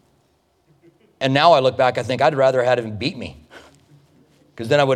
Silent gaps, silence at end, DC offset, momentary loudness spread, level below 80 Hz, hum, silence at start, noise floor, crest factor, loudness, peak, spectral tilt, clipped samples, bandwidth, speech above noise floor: none; 0 s; under 0.1%; 15 LU; -58 dBFS; none; 1.2 s; -62 dBFS; 20 dB; -18 LUFS; 0 dBFS; -5.5 dB/octave; under 0.1%; 11 kHz; 45 dB